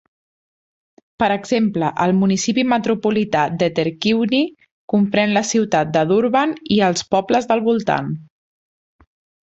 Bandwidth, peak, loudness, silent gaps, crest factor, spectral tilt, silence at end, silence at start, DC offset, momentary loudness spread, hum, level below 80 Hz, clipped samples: 8.2 kHz; -2 dBFS; -18 LUFS; 4.71-4.88 s; 16 dB; -5 dB/octave; 1.2 s; 1.2 s; under 0.1%; 4 LU; none; -56 dBFS; under 0.1%